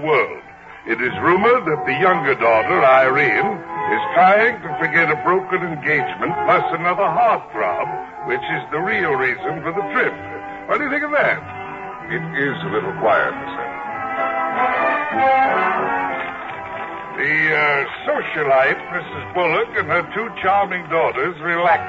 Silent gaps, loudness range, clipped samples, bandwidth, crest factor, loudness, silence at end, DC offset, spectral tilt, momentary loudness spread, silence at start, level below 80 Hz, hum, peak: none; 6 LU; under 0.1%; 7.6 kHz; 16 dB; -18 LUFS; 0 s; under 0.1%; -7 dB/octave; 12 LU; 0 s; -56 dBFS; none; -4 dBFS